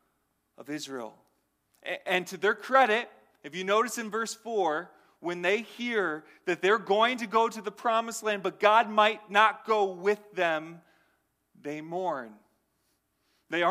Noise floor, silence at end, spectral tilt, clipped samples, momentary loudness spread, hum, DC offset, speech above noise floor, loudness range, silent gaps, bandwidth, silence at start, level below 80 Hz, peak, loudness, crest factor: -75 dBFS; 0 s; -3.5 dB/octave; under 0.1%; 16 LU; none; under 0.1%; 47 dB; 6 LU; none; 15.5 kHz; 0.6 s; -84 dBFS; -8 dBFS; -28 LUFS; 22 dB